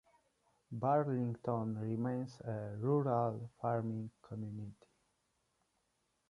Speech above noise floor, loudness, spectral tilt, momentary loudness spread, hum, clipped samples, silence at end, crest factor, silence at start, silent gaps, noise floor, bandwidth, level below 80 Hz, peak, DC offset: 44 dB; -38 LUFS; -10 dB/octave; 13 LU; none; under 0.1%; 1.55 s; 18 dB; 0.7 s; none; -81 dBFS; 10.5 kHz; -74 dBFS; -20 dBFS; under 0.1%